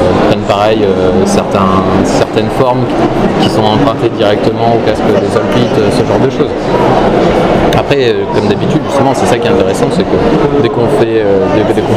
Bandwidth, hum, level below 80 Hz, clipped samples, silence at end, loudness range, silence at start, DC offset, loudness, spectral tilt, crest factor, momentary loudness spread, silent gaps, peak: 15.5 kHz; none; -28 dBFS; 0.5%; 0 s; 0 LU; 0 s; under 0.1%; -9 LUFS; -6.5 dB/octave; 8 dB; 2 LU; none; 0 dBFS